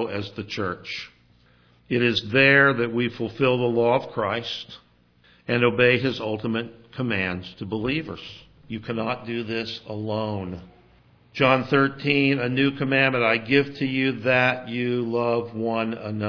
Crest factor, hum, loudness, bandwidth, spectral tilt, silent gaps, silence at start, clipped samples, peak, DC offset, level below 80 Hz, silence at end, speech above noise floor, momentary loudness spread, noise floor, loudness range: 20 dB; none; -23 LUFS; 5.4 kHz; -7 dB/octave; none; 0 s; under 0.1%; -4 dBFS; under 0.1%; -58 dBFS; 0 s; 35 dB; 14 LU; -58 dBFS; 8 LU